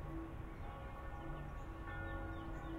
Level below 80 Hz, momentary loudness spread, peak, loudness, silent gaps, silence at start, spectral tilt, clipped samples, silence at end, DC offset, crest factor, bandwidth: -50 dBFS; 4 LU; -34 dBFS; -49 LUFS; none; 0 s; -7.5 dB/octave; under 0.1%; 0 s; under 0.1%; 12 dB; 15.5 kHz